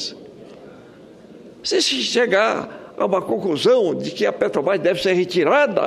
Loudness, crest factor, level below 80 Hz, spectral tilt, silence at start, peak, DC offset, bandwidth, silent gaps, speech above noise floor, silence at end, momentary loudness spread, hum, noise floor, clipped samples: -19 LUFS; 18 dB; -62 dBFS; -3.5 dB/octave; 0 s; -2 dBFS; under 0.1%; 13.5 kHz; none; 25 dB; 0 s; 10 LU; none; -43 dBFS; under 0.1%